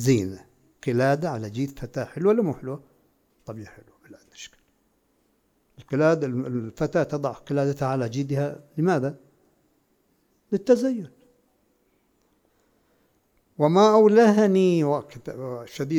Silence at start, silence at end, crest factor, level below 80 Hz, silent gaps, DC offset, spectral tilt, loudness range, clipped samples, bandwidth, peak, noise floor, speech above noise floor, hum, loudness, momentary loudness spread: 0 s; 0 s; 18 dB; -60 dBFS; none; under 0.1%; -7 dB/octave; 9 LU; under 0.1%; 17 kHz; -6 dBFS; -68 dBFS; 45 dB; none; -23 LUFS; 23 LU